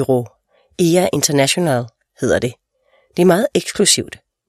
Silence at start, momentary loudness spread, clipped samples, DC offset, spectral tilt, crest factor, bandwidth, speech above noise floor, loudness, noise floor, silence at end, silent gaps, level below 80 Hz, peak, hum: 0 s; 13 LU; under 0.1%; under 0.1%; -4 dB/octave; 18 dB; 15 kHz; 43 dB; -16 LUFS; -59 dBFS; 0.4 s; none; -52 dBFS; 0 dBFS; none